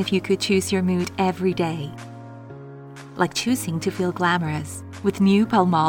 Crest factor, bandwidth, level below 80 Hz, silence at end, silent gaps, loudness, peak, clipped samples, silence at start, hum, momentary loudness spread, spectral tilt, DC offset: 18 dB; 18 kHz; -56 dBFS; 0 s; none; -22 LUFS; -6 dBFS; under 0.1%; 0 s; none; 21 LU; -5.5 dB/octave; under 0.1%